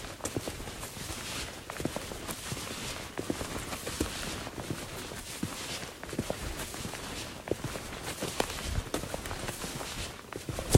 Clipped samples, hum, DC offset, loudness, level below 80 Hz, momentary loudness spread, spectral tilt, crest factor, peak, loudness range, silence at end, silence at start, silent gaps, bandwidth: under 0.1%; none; under 0.1%; -37 LUFS; -48 dBFS; 5 LU; -4 dB/octave; 28 dB; -8 dBFS; 1 LU; 0 s; 0 s; none; 16 kHz